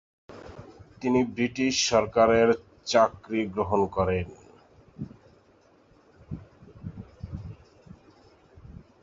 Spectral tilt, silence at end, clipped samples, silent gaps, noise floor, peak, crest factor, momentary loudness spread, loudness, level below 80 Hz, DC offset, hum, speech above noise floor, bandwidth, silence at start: -4.5 dB/octave; 0.3 s; under 0.1%; none; -60 dBFS; -6 dBFS; 22 dB; 23 LU; -25 LUFS; -50 dBFS; under 0.1%; none; 36 dB; 7.8 kHz; 0.3 s